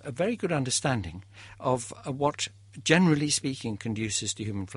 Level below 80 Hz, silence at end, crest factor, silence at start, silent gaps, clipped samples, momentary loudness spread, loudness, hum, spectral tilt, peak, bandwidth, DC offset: -58 dBFS; 0 s; 22 dB; 0.05 s; none; under 0.1%; 11 LU; -28 LUFS; none; -4 dB/octave; -8 dBFS; 11.5 kHz; under 0.1%